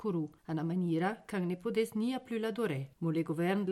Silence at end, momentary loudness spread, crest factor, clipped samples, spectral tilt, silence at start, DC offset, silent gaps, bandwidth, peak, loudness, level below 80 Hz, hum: 0 s; 5 LU; 14 dB; under 0.1%; -7.5 dB/octave; 0 s; under 0.1%; none; 14.5 kHz; -20 dBFS; -35 LUFS; -74 dBFS; none